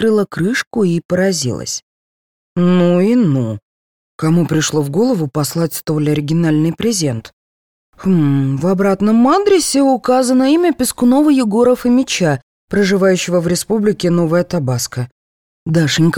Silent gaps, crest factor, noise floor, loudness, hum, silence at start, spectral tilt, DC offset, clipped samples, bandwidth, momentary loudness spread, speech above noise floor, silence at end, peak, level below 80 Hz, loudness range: 0.67-0.71 s, 1.05-1.09 s, 1.83-2.56 s, 3.62-4.19 s, 7.33-7.93 s, 12.43-12.68 s, 15.12-15.66 s; 12 dB; under -90 dBFS; -14 LUFS; none; 0 s; -5.5 dB/octave; under 0.1%; under 0.1%; 19 kHz; 9 LU; over 77 dB; 0 s; -2 dBFS; -48 dBFS; 4 LU